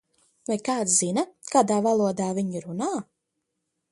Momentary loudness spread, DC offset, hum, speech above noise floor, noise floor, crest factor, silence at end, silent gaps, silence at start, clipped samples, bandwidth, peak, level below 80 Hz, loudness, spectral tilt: 9 LU; under 0.1%; none; 56 dB; -80 dBFS; 20 dB; 0.9 s; none; 0.5 s; under 0.1%; 11.5 kHz; -6 dBFS; -70 dBFS; -25 LUFS; -4.5 dB/octave